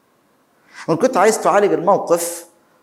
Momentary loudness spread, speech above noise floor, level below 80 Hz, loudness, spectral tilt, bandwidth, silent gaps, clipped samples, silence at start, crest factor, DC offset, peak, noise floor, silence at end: 12 LU; 43 dB; -68 dBFS; -16 LUFS; -4.5 dB/octave; 16.5 kHz; none; under 0.1%; 0.75 s; 18 dB; under 0.1%; 0 dBFS; -59 dBFS; 0.4 s